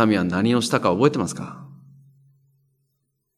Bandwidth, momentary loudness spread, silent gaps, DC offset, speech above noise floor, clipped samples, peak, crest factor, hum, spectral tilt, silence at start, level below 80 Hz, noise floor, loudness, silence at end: 14.5 kHz; 16 LU; none; under 0.1%; 54 dB; under 0.1%; -4 dBFS; 20 dB; none; -5.5 dB/octave; 0 s; -64 dBFS; -74 dBFS; -20 LUFS; 1.6 s